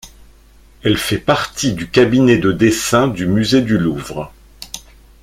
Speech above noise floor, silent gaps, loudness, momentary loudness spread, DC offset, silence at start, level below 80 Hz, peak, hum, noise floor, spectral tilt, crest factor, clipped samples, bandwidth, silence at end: 31 dB; none; -15 LUFS; 19 LU; under 0.1%; 0.05 s; -40 dBFS; 0 dBFS; none; -45 dBFS; -5 dB/octave; 16 dB; under 0.1%; 16.5 kHz; 0.45 s